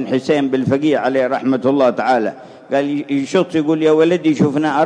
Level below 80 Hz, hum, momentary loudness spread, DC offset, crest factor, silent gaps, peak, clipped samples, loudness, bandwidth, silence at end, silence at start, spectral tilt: -62 dBFS; none; 6 LU; under 0.1%; 14 dB; none; 0 dBFS; under 0.1%; -16 LUFS; 9.8 kHz; 0 s; 0 s; -6.5 dB/octave